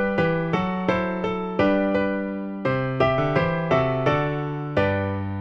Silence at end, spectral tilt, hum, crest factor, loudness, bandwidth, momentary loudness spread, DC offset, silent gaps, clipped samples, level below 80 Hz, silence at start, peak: 0 s; -8 dB/octave; none; 16 dB; -23 LUFS; 7.2 kHz; 6 LU; under 0.1%; none; under 0.1%; -46 dBFS; 0 s; -6 dBFS